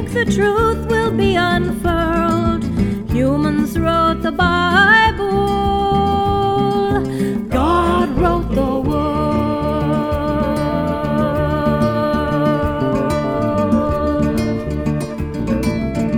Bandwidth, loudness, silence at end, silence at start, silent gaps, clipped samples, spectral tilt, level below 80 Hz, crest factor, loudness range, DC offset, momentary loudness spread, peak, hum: 17.5 kHz; -17 LUFS; 0 s; 0 s; none; under 0.1%; -6.5 dB/octave; -28 dBFS; 16 dB; 3 LU; under 0.1%; 5 LU; 0 dBFS; none